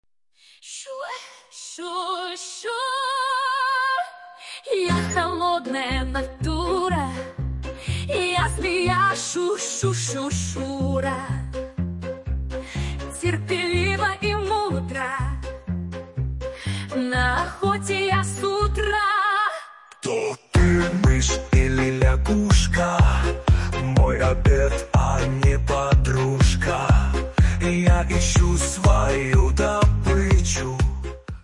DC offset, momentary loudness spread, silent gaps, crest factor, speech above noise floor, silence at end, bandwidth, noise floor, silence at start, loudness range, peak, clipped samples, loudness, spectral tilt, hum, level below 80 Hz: under 0.1%; 11 LU; none; 16 dB; 31 dB; 0 s; 11.5 kHz; -57 dBFS; 0.65 s; 6 LU; -6 dBFS; under 0.1%; -22 LUFS; -5 dB/octave; none; -26 dBFS